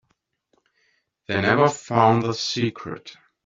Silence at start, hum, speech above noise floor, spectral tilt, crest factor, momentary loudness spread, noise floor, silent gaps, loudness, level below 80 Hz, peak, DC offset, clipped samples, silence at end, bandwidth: 1.3 s; none; 51 dB; -5 dB/octave; 20 dB; 17 LU; -72 dBFS; none; -21 LUFS; -62 dBFS; -2 dBFS; under 0.1%; under 0.1%; 0.3 s; 7.8 kHz